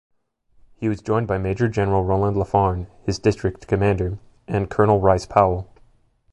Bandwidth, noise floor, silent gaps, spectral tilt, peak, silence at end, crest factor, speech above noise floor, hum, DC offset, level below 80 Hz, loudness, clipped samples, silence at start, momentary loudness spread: 10.5 kHz; -58 dBFS; none; -7.5 dB/octave; 0 dBFS; 0.7 s; 20 dB; 38 dB; none; under 0.1%; -38 dBFS; -21 LUFS; under 0.1%; 0.8 s; 10 LU